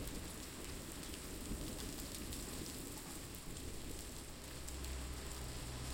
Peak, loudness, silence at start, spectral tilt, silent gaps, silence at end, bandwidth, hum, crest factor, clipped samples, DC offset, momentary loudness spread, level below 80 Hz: -28 dBFS; -47 LUFS; 0 s; -3.5 dB/octave; none; 0 s; 17 kHz; none; 20 dB; under 0.1%; under 0.1%; 3 LU; -52 dBFS